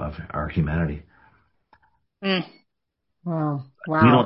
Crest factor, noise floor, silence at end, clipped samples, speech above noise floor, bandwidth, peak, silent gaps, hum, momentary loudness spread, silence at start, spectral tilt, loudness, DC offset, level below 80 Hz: 22 dB; -79 dBFS; 0 s; under 0.1%; 57 dB; 5.6 kHz; -2 dBFS; none; none; 15 LU; 0 s; -11.5 dB/octave; -25 LUFS; under 0.1%; -42 dBFS